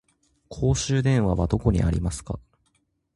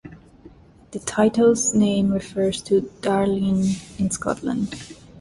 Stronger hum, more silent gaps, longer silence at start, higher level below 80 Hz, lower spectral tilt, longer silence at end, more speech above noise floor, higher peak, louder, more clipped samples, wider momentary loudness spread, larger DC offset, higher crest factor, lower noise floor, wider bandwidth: neither; neither; first, 0.5 s vs 0.05 s; first, -34 dBFS vs -50 dBFS; about the same, -6 dB/octave vs -5 dB/octave; first, 0.75 s vs 0 s; first, 48 dB vs 27 dB; about the same, -6 dBFS vs -6 dBFS; second, -24 LUFS vs -21 LUFS; neither; about the same, 14 LU vs 12 LU; neither; about the same, 18 dB vs 16 dB; first, -70 dBFS vs -48 dBFS; about the same, 11.5 kHz vs 11.5 kHz